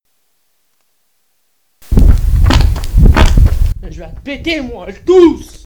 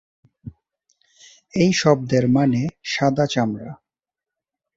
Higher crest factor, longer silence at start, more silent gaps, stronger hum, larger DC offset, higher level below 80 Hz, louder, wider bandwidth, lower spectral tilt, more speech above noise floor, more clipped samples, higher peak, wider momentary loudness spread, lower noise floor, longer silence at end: second, 10 dB vs 20 dB; first, 1.9 s vs 0.45 s; neither; neither; neither; first, -12 dBFS vs -56 dBFS; first, -12 LUFS vs -20 LUFS; first, 19 kHz vs 7.8 kHz; about the same, -7 dB/octave vs -6 dB/octave; second, 50 dB vs 69 dB; first, 1% vs under 0.1%; about the same, 0 dBFS vs -2 dBFS; first, 17 LU vs 10 LU; second, -63 dBFS vs -88 dBFS; second, 0.1 s vs 1 s